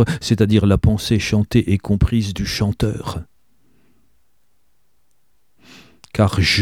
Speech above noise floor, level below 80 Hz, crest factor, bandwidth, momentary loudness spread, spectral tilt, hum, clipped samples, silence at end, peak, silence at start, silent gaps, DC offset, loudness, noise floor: 51 dB; -32 dBFS; 18 dB; 15 kHz; 10 LU; -6 dB/octave; none; under 0.1%; 0 s; -2 dBFS; 0 s; none; 0.2%; -18 LUFS; -68 dBFS